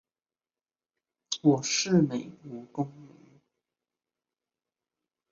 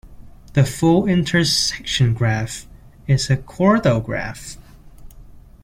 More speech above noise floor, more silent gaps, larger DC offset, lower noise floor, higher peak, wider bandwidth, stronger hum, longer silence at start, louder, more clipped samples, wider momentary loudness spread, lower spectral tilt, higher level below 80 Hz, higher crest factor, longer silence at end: first, over 63 dB vs 24 dB; neither; neither; first, under -90 dBFS vs -42 dBFS; second, -10 dBFS vs -2 dBFS; second, 7.8 kHz vs 16 kHz; neither; first, 1.3 s vs 0.05 s; second, -27 LUFS vs -18 LUFS; neither; about the same, 16 LU vs 14 LU; about the same, -4.5 dB/octave vs -5 dB/octave; second, -74 dBFS vs -40 dBFS; about the same, 22 dB vs 18 dB; first, 2.25 s vs 0.25 s